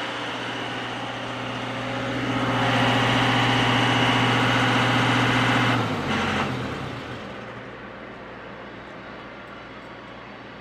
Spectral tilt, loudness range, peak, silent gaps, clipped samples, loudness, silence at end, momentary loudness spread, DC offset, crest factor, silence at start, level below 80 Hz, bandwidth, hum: -5 dB/octave; 17 LU; -8 dBFS; none; under 0.1%; -22 LUFS; 0 s; 19 LU; under 0.1%; 16 dB; 0 s; -50 dBFS; 13.5 kHz; none